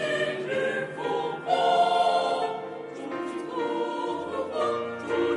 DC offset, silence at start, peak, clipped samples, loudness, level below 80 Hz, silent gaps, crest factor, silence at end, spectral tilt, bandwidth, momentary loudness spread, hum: under 0.1%; 0 s; -10 dBFS; under 0.1%; -27 LUFS; -66 dBFS; none; 18 dB; 0 s; -4.5 dB/octave; 11 kHz; 11 LU; none